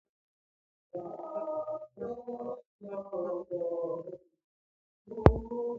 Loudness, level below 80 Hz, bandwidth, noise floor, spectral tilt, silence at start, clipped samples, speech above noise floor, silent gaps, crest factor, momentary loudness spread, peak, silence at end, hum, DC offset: -34 LUFS; -44 dBFS; 6.4 kHz; under -90 dBFS; -9 dB/octave; 0.95 s; under 0.1%; over 54 dB; 2.66-2.79 s, 4.44-5.05 s; 34 dB; 19 LU; 0 dBFS; 0 s; none; under 0.1%